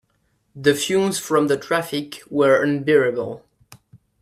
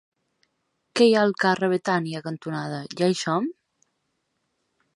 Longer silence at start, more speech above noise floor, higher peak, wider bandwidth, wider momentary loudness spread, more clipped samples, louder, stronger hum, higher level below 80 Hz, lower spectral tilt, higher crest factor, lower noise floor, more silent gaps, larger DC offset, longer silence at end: second, 0.55 s vs 0.95 s; second, 47 dB vs 53 dB; about the same, -2 dBFS vs -4 dBFS; first, 15.5 kHz vs 11.5 kHz; about the same, 11 LU vs 13 LU; neither; first, -20 LUFS vs -23 LUFS; neither; first, -62 dBFS vs -74 dBFS; about the same, -4.5 dB/octave vs -5.5 dB/octave; about the same, 18 dB vs 20 dB; second, -67 dBFS vs -75 dBFS; neither; neither; second, 0.25 s vs 1.45 s